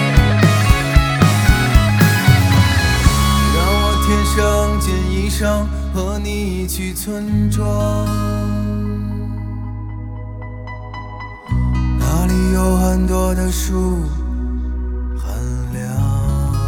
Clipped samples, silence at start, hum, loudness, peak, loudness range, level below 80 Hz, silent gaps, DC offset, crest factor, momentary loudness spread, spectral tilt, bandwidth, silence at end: under 0.1%; 0 s; none; -17 LUFS; 0 dBFS; 9 LU; -20 dBFS; none; under 0.1%; 16 dB; 14 LU; -5.5 dB/octave; over 20 kHz; 0 s